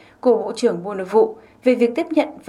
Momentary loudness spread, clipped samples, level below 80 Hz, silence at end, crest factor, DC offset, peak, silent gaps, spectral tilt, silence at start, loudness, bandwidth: 4 LU; under 0.1%; -66 dBFS; 0.1 s; 16 dB; under 0.1%; -2 dBFS; none; -5.5 dB/octave; 0.25 s; -19 LUFS; 11.5 kHz